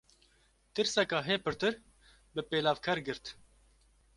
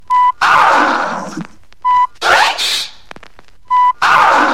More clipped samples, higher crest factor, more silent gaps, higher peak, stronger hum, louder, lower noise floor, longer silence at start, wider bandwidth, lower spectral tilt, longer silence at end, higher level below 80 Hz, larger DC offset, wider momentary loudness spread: neither; first, 22 dB vs 12 dB; neither; second, -14 dBFS vs 0 dBFS; neither; second, -33 LUFS vs -11 LUFS; first, -69 dBFS vs -43 dBFS; first, 0.75 s vs 0.1 s; second, 11.5 kHz vs 16.5 kHz; first, -3.5 dB/octave vs -1.5 dB/octave; first, 0.85 s vs 0 s; second, -64 dBFS vs -50 dBFS; second, under 0.1% vs 2%; about the same, 12 LU vs 13 LU